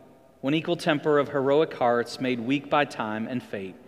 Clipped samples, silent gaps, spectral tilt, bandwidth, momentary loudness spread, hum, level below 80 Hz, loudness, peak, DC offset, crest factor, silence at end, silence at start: under 0.1%; none; -6 dB/octave; 14 kHz; 9 LU; none; -70 dBFS; -26 LUFS; -6 dBFS; under 0.1%; 20 dB; 0.1 s; 0.45 s